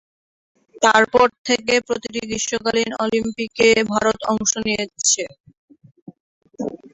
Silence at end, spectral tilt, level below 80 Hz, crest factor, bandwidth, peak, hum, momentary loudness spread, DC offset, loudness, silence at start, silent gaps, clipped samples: 0.15 s; -2 dB/octave; -54 dBFS; 18 dB; 8.4 kHz; -2 dBFS; none; 11 LU; under 0.1%; -18 LUFS; 0.75 s; 1.38-1.45 s, 5.40-5.44 s, 5.58-5.68 s, 6.02-6.06 s, 6.20-6.41 s; under 0.1%